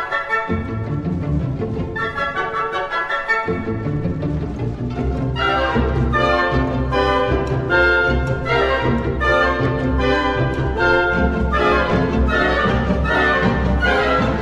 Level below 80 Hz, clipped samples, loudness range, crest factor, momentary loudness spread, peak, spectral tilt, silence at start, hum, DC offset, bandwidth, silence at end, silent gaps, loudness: -26 dBFS; under 0.1%; 5 LU; 16 dB; 7 LU; -2 dBFS; -7 dB/octave; 0 s; none; under 0.1%; 8.4 kHz; 0 s; none; -18 LUFS